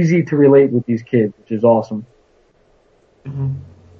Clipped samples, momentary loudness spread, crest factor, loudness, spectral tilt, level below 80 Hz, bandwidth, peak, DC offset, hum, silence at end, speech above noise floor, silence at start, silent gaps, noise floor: under 0.1%; 19 LU; 16 dB; -15 LUFS; -9 dB/octave; -56 dBFS; 6.6 kHz; 0 dBFS; under 0.1%; none; 0.35 s; 40 dB; 0 s; none; -55 dBFS